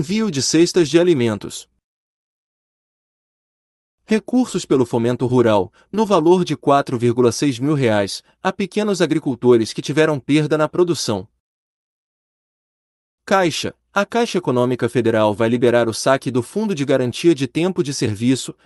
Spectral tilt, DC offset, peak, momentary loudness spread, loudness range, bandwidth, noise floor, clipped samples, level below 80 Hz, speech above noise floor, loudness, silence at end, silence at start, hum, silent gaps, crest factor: -5.5 dB/octave; under 0.1%; -2 dBFS; 7 LU; 6 LU; 12 kHz; under -90 dBFS; under 0.1%; -58 dBFS; over 73 dB; -18 LUFS; 0.15 s; 0 s; none; 1.84-3.98 s, 11.40-13.18 s; 16 dB